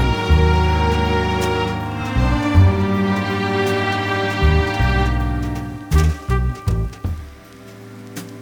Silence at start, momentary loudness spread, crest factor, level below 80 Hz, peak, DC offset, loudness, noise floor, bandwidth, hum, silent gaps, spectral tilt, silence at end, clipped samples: 0 s; 14 LU; 16 dB; -22 dBFS; -2 dBFS; under 0.1%; -18 LUFS; -39 dBFS; 17 kHz; none; none; -6.5 dB/octave; 0 s; under 0.1%